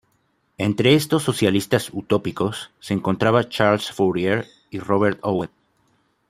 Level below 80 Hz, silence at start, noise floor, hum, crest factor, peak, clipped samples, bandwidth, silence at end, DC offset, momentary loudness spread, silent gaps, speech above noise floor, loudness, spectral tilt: -58 dBFS; 0.6 s; -66 dBFS; none; 20 dB; -2 dBFS; under 0.1%; 15.5 kHz; 0.85 s; under 0.1%; 9 LU; none; 46 dB; -21 LUFS; -5.5 dB/octave